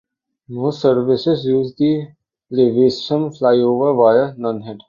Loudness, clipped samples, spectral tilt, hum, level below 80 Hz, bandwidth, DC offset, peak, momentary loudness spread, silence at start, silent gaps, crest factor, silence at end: -16 LUFS; under 0.1%; -7.5 dB/octave; none; -58 dBFS; 7.2 kHz; under 0.1%; -2 dBFS; 10 LU; 0.5 s; none; 14 dB; 0.1 s